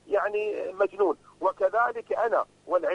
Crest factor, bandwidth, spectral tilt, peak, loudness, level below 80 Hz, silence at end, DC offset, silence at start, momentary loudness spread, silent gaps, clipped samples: 14 dB; 10 kHz; -5 dB/octave; -12 dBFS; -27 LUFS; -70 dBFS; 0 s; under 0.1%; 0.05 s; 5 LU; none; under 0.1%